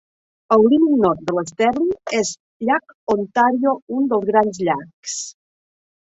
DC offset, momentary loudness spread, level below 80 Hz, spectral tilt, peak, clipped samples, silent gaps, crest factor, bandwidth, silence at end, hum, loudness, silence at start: under 0.1%; 12 LU; -58 dBFS; -4.5 dB/octave; -2 dBFS; under 0.1%; 2.40-2.60 s, 2.94-3.07 s, 3.82-3.87 s, 4.93-5.03 s; 16 dB; 8.4 kHz; 0.85 s; none; -19 LUFS; 0.5 s